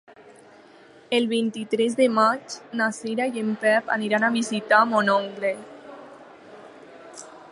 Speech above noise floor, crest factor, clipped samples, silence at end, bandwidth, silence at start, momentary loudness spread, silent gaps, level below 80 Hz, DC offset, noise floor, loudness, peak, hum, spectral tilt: 28 dB; 20 dB; under 0.1%; 0.05 s; 11.5 kHz; 1.1 s; 23 LU; none; -76 dBFS; under 0.1%; -50 dBFS; -23 LUFS; -4 dBFS; none; -4 dB/octave